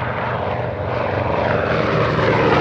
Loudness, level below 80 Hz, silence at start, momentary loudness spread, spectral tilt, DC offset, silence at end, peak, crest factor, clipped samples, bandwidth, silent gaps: -19 LUFS; -38 dBFS; 0 s; 7 LU; -7.5 dB/octave; under 0.1%; 0 s; -2 dBFS; 16 dB; under 0.1%; 7.6 kHz; none